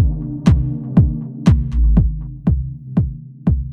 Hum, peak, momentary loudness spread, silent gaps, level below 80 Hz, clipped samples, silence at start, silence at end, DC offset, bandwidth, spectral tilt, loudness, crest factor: none; 0 dBFS; 6 LU; none; -20 dBFS; under 0.1%; 0 s; 0 s; under 0.1%; 7.2 kHz; -9 dB/octave; -18 LUFS; 16 dB